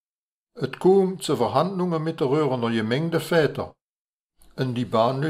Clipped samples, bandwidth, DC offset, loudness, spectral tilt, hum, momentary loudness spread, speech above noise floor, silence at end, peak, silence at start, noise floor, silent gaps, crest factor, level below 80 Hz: under 0.1%; 15.5 kHz; under 0.1%; -23 LUFS; -6.5 dB/octave; none; 13 LU; over 68 dB; 0 s; -6 dBFS; 0.55 s; under -90 dBFS; 3.82-4.30 s; 18 dB; -62 dBFS